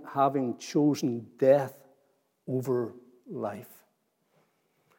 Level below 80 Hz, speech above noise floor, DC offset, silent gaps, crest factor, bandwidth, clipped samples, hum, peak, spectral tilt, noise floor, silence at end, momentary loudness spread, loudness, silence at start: -88 dBFS; 46 dB; under 0.1%; none; 20 dB; 17 kHz; under 0.1%; none; -10 dBFS; -7 dB/octave; -73 dBFS; 1.3 s; 15 LU; -29 LUFS; 0 s